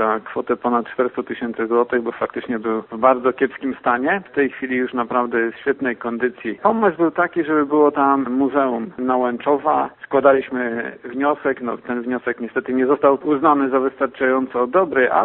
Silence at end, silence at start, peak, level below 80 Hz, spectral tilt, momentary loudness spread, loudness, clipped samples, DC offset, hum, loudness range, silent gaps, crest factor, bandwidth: 0 s; 0 s; 0 dBFS; -60 dBFS; -11 dB/octave; 8 LU; -19 LUFS; under 0.1%; under 0.1%; none; 3 LU; none; 18 dB; 4.1 kHz